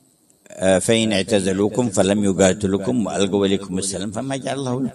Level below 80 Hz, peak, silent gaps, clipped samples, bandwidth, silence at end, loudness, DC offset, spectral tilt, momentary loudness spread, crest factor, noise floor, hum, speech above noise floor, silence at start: -46 dBFS; 0 dBFS; none; under 0.1%; 12.5 kHz; 0 s; -19 LUFS; under 0.1%; -4.5 dB/octave; 8 LU; 18 dB; -55 dBFS; none; 36 dB; 0.5 s